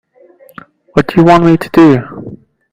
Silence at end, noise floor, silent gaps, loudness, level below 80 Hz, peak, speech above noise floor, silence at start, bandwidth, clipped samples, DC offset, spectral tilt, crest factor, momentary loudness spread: 0.35 s; -43 dBFS; none; -9 LUFS; -40 dBFS; 0 dBFS; 35 dB; 0.95 s; 15.5 kHz; 1%; under 0.1%; -8 dB/octave; 10 dB; 21 LU